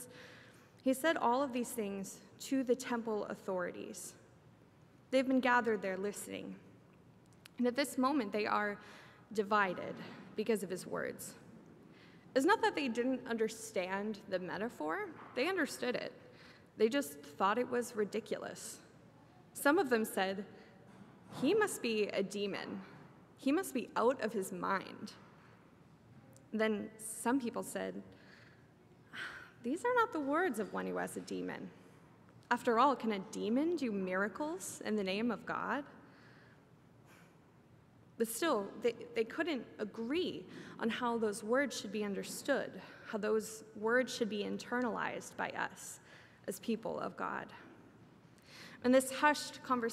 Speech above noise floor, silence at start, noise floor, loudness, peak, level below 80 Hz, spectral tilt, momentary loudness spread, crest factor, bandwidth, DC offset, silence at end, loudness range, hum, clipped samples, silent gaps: 27 dB; 0 s; -63 dBFS; -36 LUFS; -16 dBFS; -78 dBFS; -4 dB/octave; 16 LU; 22 dB; 16 kHz; under 0.1%; 0 s; 4 LU; none; under 0.1%; none